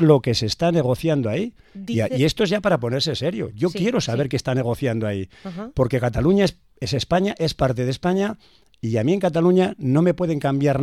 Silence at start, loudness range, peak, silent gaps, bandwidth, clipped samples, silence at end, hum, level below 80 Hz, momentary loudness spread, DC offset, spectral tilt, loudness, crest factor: 0 s; 2 LU; -2 dBFS; none; 14.5 kHz; under 0.1%; 0 s; none; -44 dBFS; 9 LU; 0.1%; -6.5 dB/octave; -21 LUFS; 18 dB